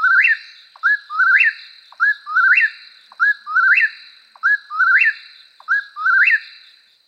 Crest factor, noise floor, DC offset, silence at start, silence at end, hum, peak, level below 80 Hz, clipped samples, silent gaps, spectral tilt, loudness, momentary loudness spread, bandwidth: 14 dB; -49 dBFS; under 0.1%; 0 s; 0.6 s; none; -4 dBFS; under -90 dBFS; under 0.1%; none; 4.5 dB/octave; -15 LUFS; 8 LU; 8.6 kHz